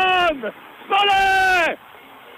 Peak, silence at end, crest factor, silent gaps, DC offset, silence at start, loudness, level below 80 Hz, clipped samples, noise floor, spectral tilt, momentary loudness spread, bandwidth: -8 dBFS; 0.05 s; 12 dB; none; under 0.1%; 0 s; -17 LUFS; -48 dBFS; under 0.1%; -43 dBFS; -2 dB/octave; 15 LU; 15.5 kHz